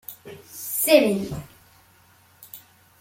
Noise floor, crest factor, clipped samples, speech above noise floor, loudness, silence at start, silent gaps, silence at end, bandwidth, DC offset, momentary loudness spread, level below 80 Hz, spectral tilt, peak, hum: -56 dBFS; 24 dB; under 0.1%; 35 dB; -20 LUFS; 0.1 s; none; 0.4 s; 16.5 kHz; under 0.1%; 25 LU; -56 dBFS; -3.5 dB/octave; -2 dBFS; none